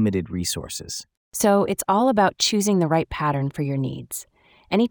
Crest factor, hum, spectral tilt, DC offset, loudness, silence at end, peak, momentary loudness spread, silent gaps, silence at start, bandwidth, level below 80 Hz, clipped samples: 18 dB; none; -4.5 dB/octave; under 0.1%; -22 LUFS; 0 s; -4 dBFS; 14 LU; 1.17-1.32 s; 0 s; over 20 kHz; -50 dBFS; under 0.1%